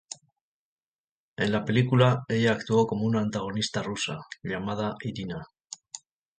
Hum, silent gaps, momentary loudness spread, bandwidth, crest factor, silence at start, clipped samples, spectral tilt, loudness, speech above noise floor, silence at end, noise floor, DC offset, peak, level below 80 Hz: none; 0.41-0.78 s, 0.86-1.36 s, 5.64-5.68 s; 20 LU; 9.4 kHz; 22 dB; 0.1 s; under 0.1%; -5.5 dB/octave; -27 LUFS; over 64 dB; 0.4 s; under -90 dBFS; under 0.1%; -6 dBFS; -60 dBFS